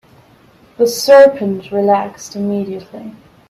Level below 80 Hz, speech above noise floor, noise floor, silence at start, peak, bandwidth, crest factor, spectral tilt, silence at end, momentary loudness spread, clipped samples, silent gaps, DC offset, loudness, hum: -56 dBFS; 34 dB; -47 dBFS; 0.8 s; 0 dBFS; 15 kHz; 14 dB; -4.5 dB/octave; 0.4 s; 20 LU; under 0.1%; none; under 0.1%; -13 LUFS; none